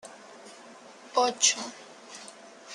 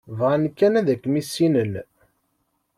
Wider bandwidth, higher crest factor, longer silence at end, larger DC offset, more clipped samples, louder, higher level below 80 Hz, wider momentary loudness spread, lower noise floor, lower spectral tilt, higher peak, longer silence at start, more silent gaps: second, 12.5 kHz vs 15 kHz; first, 24 dB vs 16 dB; second, 0 s vs 0.95 s; neither; neither; second, -25 LUFS vs -21 LUFS; second, -88 dBFS vs -64 dBFS; first, 26 LU vs 7 LU; second, -50 dBFS vs -71 dBFS; second, 0.5 dB/octave vs -6.5 dB/octave; about the same, -8 dBFS vs -6 dBFS; about the same, 0.05 s vs 0.05 s; neither